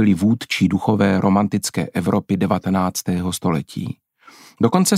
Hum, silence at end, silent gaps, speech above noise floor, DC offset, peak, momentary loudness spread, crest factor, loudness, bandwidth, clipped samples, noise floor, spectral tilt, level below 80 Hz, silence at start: none; 0 s; none; 29 dB; under 0.1%; -2 dBFS; 7 LU; 16 dB; -19 LUFS; 16 kHz; under 0.1%; -47 dBFS; -5.5 dB/octave; -52 dBFS; 0 s